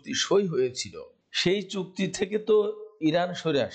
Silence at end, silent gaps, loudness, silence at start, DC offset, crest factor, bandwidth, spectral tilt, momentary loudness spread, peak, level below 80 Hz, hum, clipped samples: 0 s; none; -27 LUFS; 0.05 s; under 0.1%; 12 dB; 9 kHz; -4.5 dB/octave; 10 LU; -14 dBFS; -66 dBFS; none; under 0.1%